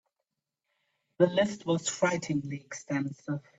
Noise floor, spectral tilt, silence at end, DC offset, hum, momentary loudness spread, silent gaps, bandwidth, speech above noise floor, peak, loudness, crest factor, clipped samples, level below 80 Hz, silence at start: -86 dBFS; -5 dB/octave; 0.2 s; under 0.1%; none; 11 LU; none; 8.2 kHz; 56 dB; -10 dBFS; -30 LUFS; 22 dB; under 0.1%; -72 dBFS; 1.2 s